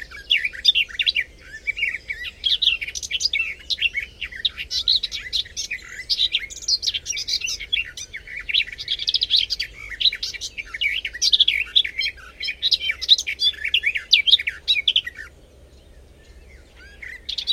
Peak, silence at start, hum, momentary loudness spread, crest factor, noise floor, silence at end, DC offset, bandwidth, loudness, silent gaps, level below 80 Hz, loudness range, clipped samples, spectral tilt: 0 dBFS; 0 s; none; 13 LU; 24 dB; -48 dBFS; 0 s; under 0.1%; 16.5 kHz; -20 LUFS; none; -48 dBFS; 5 LU; under 0.1%; 2 dB/octave